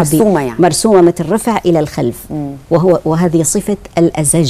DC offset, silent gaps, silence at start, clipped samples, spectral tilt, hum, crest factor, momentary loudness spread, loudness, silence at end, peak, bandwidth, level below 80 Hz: under 0.1%; none; 0 s; under 0.1%; -5.5 dB/octave; none; 12 dB; 10 LU; -12 LUFS; 0 s; 0 dBFS; 15.5 kHz; -38 dBFS